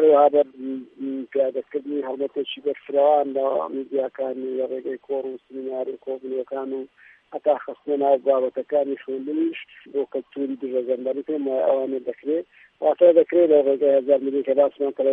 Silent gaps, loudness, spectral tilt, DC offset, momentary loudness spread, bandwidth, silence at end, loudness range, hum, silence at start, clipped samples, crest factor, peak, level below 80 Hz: none; -23 LUFS; -8.5 dB/octave; under 0.1%; 14 LU; 3.8 kHz; 0 s; 9 LU; none; 0 s; under 0.1%; 18 dB; -4 dBFS; -78 dBFS